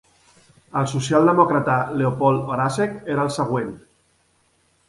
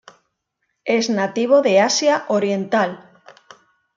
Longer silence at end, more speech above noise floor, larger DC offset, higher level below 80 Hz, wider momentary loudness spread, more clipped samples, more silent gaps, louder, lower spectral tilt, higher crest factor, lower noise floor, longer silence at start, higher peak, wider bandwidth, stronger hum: about the same, 1.1 s vs 1 s; second, 43 dB vs 57 dB; neither; first, -58 dBFS vs -72 dBFS; about the same, 9 LU vs 9 LU; neither; neither; about the same, -20 LUFS vs -18 LUFS; first, -6.5 dB/octave vs -3.5 dB/octave; about the same, 20 dB vs 16 dB; second, -63 dBFS vs -74 dBFS; about the same, 0.75 s vs 0.85 s; about the same, -2 dBFS vs -4 dBFS; first, 11.5 kHz vs 7.6 kHz; neither